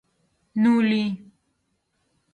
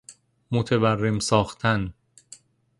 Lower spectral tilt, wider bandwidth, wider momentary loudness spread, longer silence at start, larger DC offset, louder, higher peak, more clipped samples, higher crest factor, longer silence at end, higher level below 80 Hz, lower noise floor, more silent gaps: first, -7 dB/octave vs -5.5 dB/octave; second, 9 kHz vs 11.5 kHz; first, 14 LU vs 6 LU; first, 0.55 s vs 0.1 s; neither; about the same, -22 LUFS vs -23 LUFS; second, -10 dBFS vs -4 dBFS; neither; second, 16 dB vs 22 dB; first, 1.15 s vs 0.85 s; second, -72 dBFS vs -50 dBFS; first, -73 dBFS vs -51 dBFS; neither